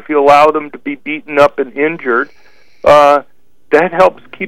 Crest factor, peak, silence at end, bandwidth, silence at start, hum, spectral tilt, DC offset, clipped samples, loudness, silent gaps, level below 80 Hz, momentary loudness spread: 12 dB; 0 dBFS; 0 s; 12.5 kHz; 0.1 s; none; -5 dB/octave; 1%; 0.7%; -11 LUFS; none; -46 dBFS; 14 LU